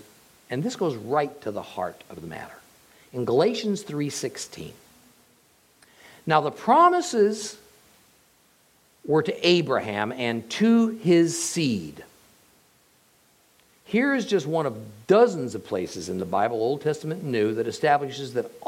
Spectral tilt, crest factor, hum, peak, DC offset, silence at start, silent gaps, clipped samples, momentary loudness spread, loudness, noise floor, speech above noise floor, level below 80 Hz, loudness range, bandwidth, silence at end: -5 dB/octave; 20 dB; none; -4 dBFS; under 0.1%; 0.5 s; none; under 0.1%; 17 LU; -24 LUFS; -61 dBFS; 37 dB; -70 dBFS; 6 LU; 16.5 kHz; 0 s